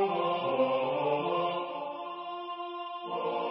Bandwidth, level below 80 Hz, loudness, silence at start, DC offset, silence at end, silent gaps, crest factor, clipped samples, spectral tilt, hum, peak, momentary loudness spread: 5.6 kHz; -78 dBFS; -32 LUFS; 0 s; under 0.1%; 0 s; none; 16 dB; under 0.1%; -3 dB/octave; none; -16 dBFS; 10 LU